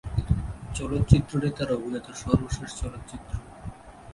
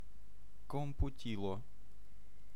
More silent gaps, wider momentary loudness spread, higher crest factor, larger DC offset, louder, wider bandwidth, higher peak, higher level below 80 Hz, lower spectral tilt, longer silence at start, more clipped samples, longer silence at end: neither; second, 20 LU vs 23 LU; first, 26 dB vs 20 dB; second, under 0.1% vs 1%; first, -28 LUFS vs -43 LUFS; second, 11.5 kHz vs 15 kHz; first, 0 dBFS vs -22 dBFS; first, -36 dBFS vs -48 dBFS; about the same, -7 dB/octave vs -7.5 dB/octave; about the same, 0.05 s vs 0 s; neither; about the same, 0 s vs 0 s